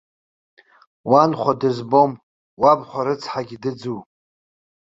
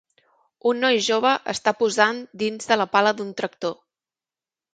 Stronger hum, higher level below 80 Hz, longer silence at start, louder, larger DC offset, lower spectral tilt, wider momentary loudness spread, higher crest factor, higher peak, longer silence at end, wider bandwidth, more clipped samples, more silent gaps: neither; first, -62 dBFS vs -70 dBFS; first, 1.05 s vs 0.65 s; first, -19 LUFS vs -22 LUFS; neither; first, -7 dB/octave vs -3 dB/octave; first, 15 LU vs 9 LU; about the same, 20 dB vs 20 dB; about the same, -2 dBFS vs -2 dBFS; about the same, 0.95 s vs 1 s; second, 7.8 kHz vs 9.4 kHz; neither; first, 2.23-2.57 s vs none